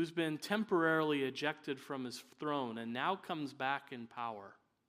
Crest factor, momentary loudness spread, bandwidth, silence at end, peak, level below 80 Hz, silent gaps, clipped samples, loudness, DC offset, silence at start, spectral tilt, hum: 20 dB; 12 LU; 15.5 kHz; 0.35 s; -18 dBFS; -86 dBFS; none; under 0.1%; -38 LUFS; under 0.1%; 0 s; -5 dB/octave; none